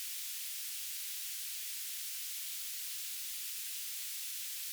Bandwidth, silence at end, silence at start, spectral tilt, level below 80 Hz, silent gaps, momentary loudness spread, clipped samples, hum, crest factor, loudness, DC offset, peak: over 20 kHz; 0 s; 0 s; 10 dB/octave; under -90 dBFS; none; 0 LU; under 0.1%; none; 14 dB; -38 LUFS; under 0.1%; -28 dBFS